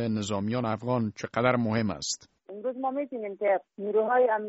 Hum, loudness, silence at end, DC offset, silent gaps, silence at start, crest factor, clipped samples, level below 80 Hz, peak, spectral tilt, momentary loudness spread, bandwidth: none; -29 LUFS; 0 s; under 0.1%; none; 0 s; 20 dB; under 0.1%; -64 dBFS; -8 dBFS; -5 dB/octave; 10 LU; 8 kHz